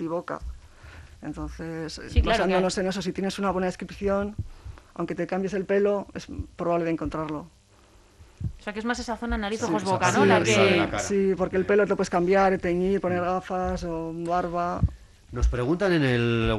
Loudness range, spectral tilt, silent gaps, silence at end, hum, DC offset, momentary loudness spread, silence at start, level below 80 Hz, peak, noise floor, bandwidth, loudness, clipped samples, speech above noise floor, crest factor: 7 LU; -5.5 dB/octave; none; 0 s; none; under 0.1%; 15 LU; 0 s; -38 dBFS; -6 dBFS; -56 dBFS; 12.5 kHz; -25 LUFS; under 0.1%; 31 dB; 20 dB